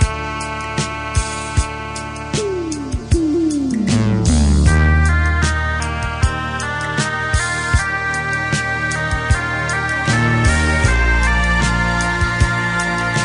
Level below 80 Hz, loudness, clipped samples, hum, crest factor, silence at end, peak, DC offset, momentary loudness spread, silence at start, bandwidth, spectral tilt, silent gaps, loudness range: -22 dBFS; -17 LUFS; under 0.1%; none; 16 dB; 0 s; 0 dBFS; under 0.1%; 7 LU; 0 s; 10.5 kHz; -5 dB/octave; none; 4 LU